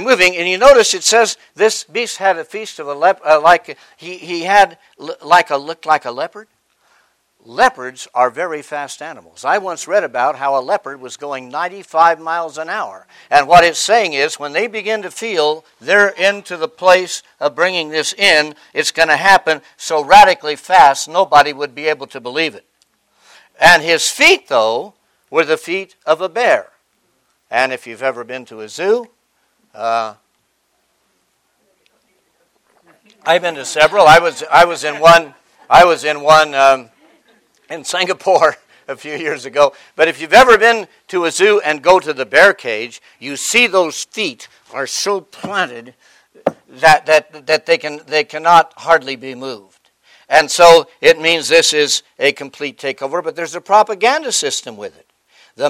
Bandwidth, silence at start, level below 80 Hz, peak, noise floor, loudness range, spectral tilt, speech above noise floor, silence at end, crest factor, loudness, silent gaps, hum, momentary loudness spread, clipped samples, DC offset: 16.5 kHz; 0 s; -50 dBFS; 0 dBFS; -64 dBFS; 8 LU; -2 dB/octave; 50 dB; 0 s; 14 dB; -13 LUFS; none; none; 17 LU; 0.4%; under 0.1%